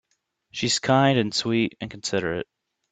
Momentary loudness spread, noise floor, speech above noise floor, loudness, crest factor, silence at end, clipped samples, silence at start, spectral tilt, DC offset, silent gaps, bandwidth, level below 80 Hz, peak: 13 LU; -72 dBFS; 49 dB; -23 LUFS; 20 dB; 0.5 s; under 0.1%; 0.55 s; -4.5 dB/octave; under 0.1%; none; 9.4 kHz; -60 dBFS; -6 dBFS